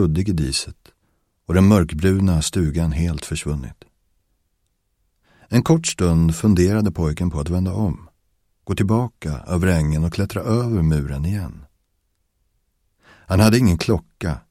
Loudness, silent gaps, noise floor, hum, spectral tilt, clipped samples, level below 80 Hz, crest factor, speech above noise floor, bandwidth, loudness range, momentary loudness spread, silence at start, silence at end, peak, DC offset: -20 LUFS; none; -69 dBFS; none; -6 dB/octave; under 0.1%; -34 dBFS; 20 dB; 51 dB; 15.5 kHz; 5 LU; 12 LU; 0 s; 0.1 s; 0 dBFS; under 0.1%